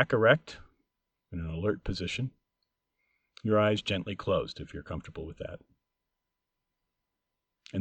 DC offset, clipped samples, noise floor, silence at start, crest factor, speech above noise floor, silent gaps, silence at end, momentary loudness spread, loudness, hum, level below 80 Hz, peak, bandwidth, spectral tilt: under 0.1%; under 0.1%; -86 dBFS; 0 s; 24 dB; 56 dB; none; 0 s; 18 LU; -31 LUFS; none; -52 dBFS; -10 dBFS; 8.8 kHz; -6 dB/octave